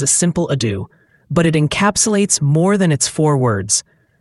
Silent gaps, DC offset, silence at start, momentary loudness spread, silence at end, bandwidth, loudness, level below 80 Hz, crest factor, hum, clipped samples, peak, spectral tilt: none; under 0.1%; 0 s; 6 LU; 0.4 s; 12 kHz; -15 LUFS; -46 dBFS; 16 dB; none; under 0.1%; 0 dBFS; -4.5 dB/octave